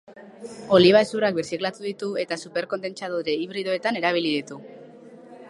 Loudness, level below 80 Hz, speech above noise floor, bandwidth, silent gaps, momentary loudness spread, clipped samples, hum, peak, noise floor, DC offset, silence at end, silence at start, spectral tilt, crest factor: -23 LUFS; -66 dBFS; 22 dB; 11.5 kHz; none; 19 LU; under 0.1%; none; -4 dBFS; -45 dBFS; under 0.1%; 0 s; 0.1 s; -5 dB/octave; 22 dB